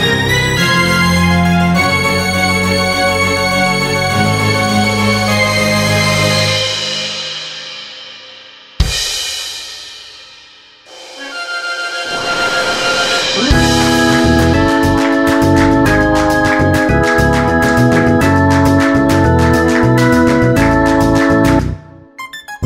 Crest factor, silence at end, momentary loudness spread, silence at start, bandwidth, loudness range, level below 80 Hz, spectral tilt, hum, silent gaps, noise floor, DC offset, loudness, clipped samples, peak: 12 dB; 0 s; 13 LU; 0 s; 16.5 kHz; 10 LU; -26 dBFS; -4.5 dB/octave; none; none; -41 dBFS; under 0.1%; -12 LUFS; under 0.1%; 0 dBFS